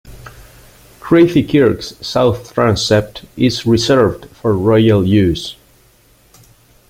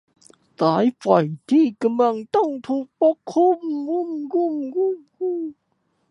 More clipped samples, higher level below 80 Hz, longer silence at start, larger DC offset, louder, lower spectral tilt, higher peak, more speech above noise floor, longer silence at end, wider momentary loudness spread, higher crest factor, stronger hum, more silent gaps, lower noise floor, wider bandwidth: neither; first, -40 dBFS vs -74 dBFS; second, 0.05 s vs 0.6 s; neither; first, -14 LUFS vs -21 LUFS; second, -6 dB/octave vs -7.5 dB/octave; about the same, 0 dBFS vs -2 dBFS; second, 37 dB vs 49 dB; first, 1.35 s vs 0.6 s; first, 11 LU vs 8 LU; second, 14 dB vs 20 dB; neither; neither; second, -50 dBFS vs -69 dBFS; first, 16 kHz vs 10.5 kHz